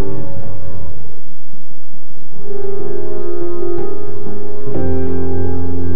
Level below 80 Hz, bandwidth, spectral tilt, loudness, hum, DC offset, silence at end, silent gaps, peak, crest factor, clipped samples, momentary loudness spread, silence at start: -40 dBFS; 5.8 kHz; -11.5 dB/octave; -25 LUFS; none; 70%; 0 s; none; 0 dBFS; 16 dB; under 0.1%; 24 LU; 0 s